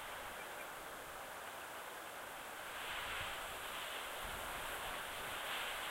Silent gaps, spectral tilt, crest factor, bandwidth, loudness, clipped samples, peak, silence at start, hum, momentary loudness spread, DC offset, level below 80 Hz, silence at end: none; -1 dB/octave; 14 dB; 16 kHz; -45 LUFS; under 0.1%; -32 dBFS; 0 s; none; 6 LU; under 0.1%; -64 dBFS; 0 s